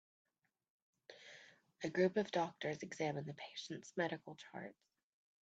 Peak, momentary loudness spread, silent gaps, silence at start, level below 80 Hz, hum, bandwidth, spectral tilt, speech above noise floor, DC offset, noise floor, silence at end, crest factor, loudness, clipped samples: -24 dBFS; 21 LU; none; 1.1 s; -84 dBFS; none; 8 kHz; -5.5 dB/octave; 22 dB; under 0.1%; -64 dBFS; 0.7 s; 20 dB; -42 LUFS; under 0.1%